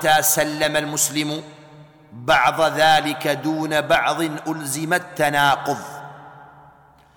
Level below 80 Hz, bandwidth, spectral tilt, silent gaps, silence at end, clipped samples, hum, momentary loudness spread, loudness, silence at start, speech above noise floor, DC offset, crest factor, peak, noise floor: -56 dBFS; 19 kHz; -2.5 dB/octave; none; 0.7 s; under 0.1%; none; 12 LU; -19 LUFS; 0 s; 31 dB; under 0.1%; 16 dB; -6 dBFS; -51 dBFS